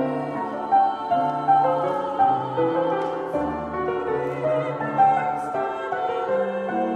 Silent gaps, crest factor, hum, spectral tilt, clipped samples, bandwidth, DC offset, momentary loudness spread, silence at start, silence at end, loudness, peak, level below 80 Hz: none; 16 dB; none; -7.5 dB/octave; under 0.1%; 9.2 kHz; under 0.1%; 7 LU; 0 s; 0 s; -23 LUFS; -8 dBFS; -56 dBFS